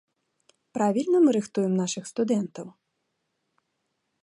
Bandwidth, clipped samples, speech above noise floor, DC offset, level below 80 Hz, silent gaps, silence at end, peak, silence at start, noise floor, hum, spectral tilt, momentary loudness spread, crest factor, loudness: 11.5 kHz; under 0.1%; 54 dB; under 0.1%; -76 dBFS; none; 1.55 s; -12 dBFS; 0.75 s; -78 dBFS; none; -6 dB/octave; 17 LU; 16 dB; -25 LUFS